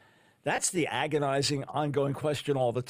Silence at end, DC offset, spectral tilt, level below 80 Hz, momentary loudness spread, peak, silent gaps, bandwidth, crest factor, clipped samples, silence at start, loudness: 0 s; under 0.1%; -4 dB/octave; -66 dBFS; 4 LU; -14 dBFS; none; 15.5 kHz; 16 dB; under 0.1%; 0.45 s; -29 LUFS